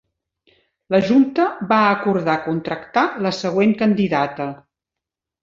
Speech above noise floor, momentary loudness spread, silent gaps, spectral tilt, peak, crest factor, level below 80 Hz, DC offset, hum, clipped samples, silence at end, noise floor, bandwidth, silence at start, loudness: 68 dB; 8 LU; none; -6.5 dB/octave; -2 dBFS; 18 dB; -58 dBFS; under 0.1%; none; under 0.1%; 0.85 s; -86 dBFS; 7.6 kHz; 0.9 s; -18 LUFS